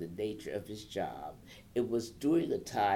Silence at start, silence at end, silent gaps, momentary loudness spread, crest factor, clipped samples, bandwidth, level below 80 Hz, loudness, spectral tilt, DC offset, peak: 0 s; 0 s; none; 13 LU; 16 dB; under 0.1%; 16.5 kHz; -64 dBFS; -35 LUFS; -5.5 dB/octave; under 0.1%; -20 dBFS